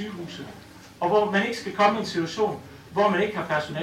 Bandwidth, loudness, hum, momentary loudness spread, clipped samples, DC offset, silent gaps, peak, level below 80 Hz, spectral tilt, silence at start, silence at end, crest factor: 15.5 kHz; -24 LUFS; none; 16 LU; under 0.1%; under 0.1%; none; -4 dBFS; -62 dBFS; -5 dB/octave; 0 s; 0 s; 20 dB